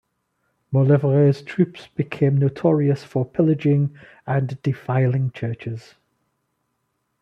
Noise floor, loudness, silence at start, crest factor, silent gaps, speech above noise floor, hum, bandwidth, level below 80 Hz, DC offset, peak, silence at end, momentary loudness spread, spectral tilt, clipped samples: -73 dBFS; -21 LUFS; 0.7 s; 16 dB; none; 53 dB; none; 6 kHz; -62 dBFS; under 0.1%; -4 dBFS; 1.4 s; 11 LU; -10 dB/octave; under 0.1%